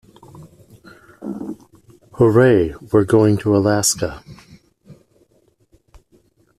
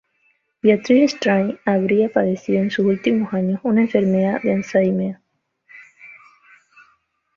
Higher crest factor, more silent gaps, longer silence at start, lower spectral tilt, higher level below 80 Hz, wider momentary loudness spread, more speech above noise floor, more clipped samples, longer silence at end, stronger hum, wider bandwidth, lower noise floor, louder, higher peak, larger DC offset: about the same, 18 dB vs 18 dB; neither; second, 0.4 s vs 0.65 s; second, -5.5 dB/octave vs -7 dB/octave; first, -48 dBFS vs -62 dBFS; first, 20 LU vs 6 LU; about the same, 44 dB vs 47 dB; neither; first, 1.65 s vs 1.25 s; neither; first, 14 kHz vs 7.2 kHz; second, -59 dBFS vs -64 dBFS; about the same, -16 LUFS vs -18 LUFS; about the same, -2 dBFS vs -2 dBFS; neither